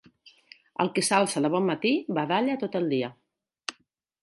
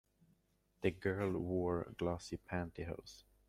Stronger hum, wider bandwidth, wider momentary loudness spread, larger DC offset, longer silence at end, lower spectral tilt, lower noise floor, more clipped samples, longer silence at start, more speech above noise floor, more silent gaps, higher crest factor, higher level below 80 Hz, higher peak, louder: neither; second, 11.5 kHz vs 14.5 kHz; first, 15 LU vs 9 LU; neither; first, 0.5 s vs 0.25 s; second, -4.5 dB/octave vs -7 dB/octave; second, -68 dBFS vs -77 dBFS; neither; second, 0.25 s vs 0.8 s; first, 43 dB vs 37 dB; neither; about the same, 20 dB vs 20 dB; second, -78 dBFS vs -64 dBFS; first, -8 dBFS vs -20 dBFS; first, -26 LUFS vs -41 LUFS